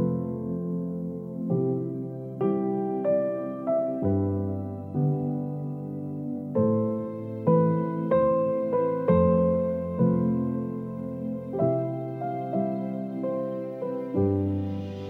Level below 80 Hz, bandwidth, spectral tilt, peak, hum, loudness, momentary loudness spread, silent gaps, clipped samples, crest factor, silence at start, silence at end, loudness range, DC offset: -56 dBFS; 4 kHz; -11.5 dB/octave; -10 dBFS; none; -27 LUFS; 10 LU; none; under 0.1%; 16 dB; 0 s; 0 s; 5 LU; under 0.1%